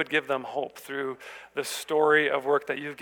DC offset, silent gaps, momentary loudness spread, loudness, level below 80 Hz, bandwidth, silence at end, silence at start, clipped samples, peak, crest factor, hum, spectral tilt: under 0.1%; none; 13 LU; -27 LUFS; -76 dBFS; 19.5 kHz; 0 s; 0 s; under 0.1%; -8 dBFS; 18 dB; none; -3 dB/octave